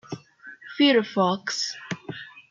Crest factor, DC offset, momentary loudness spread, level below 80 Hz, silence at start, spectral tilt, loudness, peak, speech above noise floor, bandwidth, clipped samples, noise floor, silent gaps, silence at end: 18 dB; under 0.1%; 20 LU; -74 dBFS; 0.1 s; -4 dB/octave; -24 LUFS; -8 dBFS; 24 dB; 7.6 kHz; under 0.1%; -47 dBFS; none; 0.1 s